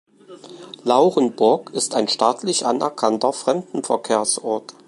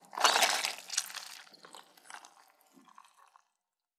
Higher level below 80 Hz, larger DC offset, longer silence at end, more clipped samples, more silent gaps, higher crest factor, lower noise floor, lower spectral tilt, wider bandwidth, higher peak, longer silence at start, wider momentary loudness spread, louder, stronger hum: first, -72 dBFS vs under -90 dBFS; neither; second, 0.15 s vs 1.7 s; neither; neither; second, 20 dB vs 28 dB; second, -42 dBFS vs -87 dBFS; first, -3.5 dB/octave vs 2 dB/octave; second, 11.5 kHz vs 17 kHz; first, -2 dBFS vs -8 dBFS; first, 0.3 s vs 0.15 s; second, 7 LU vs 27 LU; first, -20 LUFS vs -30 LUFS; neither